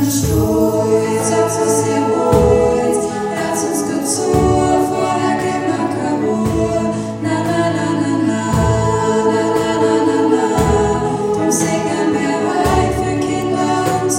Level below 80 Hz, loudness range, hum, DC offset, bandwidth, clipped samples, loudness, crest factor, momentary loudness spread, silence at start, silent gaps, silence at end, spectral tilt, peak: -34 dBFS; 2 LU; none; under 0.1%; 16.5 kHz; under 0.1%; -15 LUFS; 14 dB; 4 LU; 0 s; none; 0 s; -5.5 dB/octave; 0 dBFS